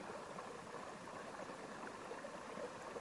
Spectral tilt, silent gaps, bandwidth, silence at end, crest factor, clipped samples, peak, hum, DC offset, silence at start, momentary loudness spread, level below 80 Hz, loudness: -4 dB/octave; none; 11.5 kHz; 0 s; 16 dB; under 0.1%; -34 dBFS; none; under 0.1%; 0 s; 2 LU; -80 dBFS; -50 LUFS